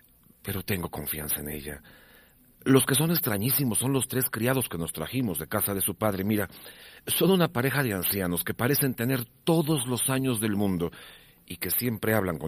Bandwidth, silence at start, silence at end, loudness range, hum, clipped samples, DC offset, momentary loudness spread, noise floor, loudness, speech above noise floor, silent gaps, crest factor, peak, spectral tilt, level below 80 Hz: 15.5 kHz; 0.45 s; 0 s; 2 LU; none; under 0.1%; under 0.1%; 12 LU; -57 dBFS; -27 LUFS; 30 dB; none; 22 dB; -6 dBFS; -4.5 dB/octave; -54 dBFS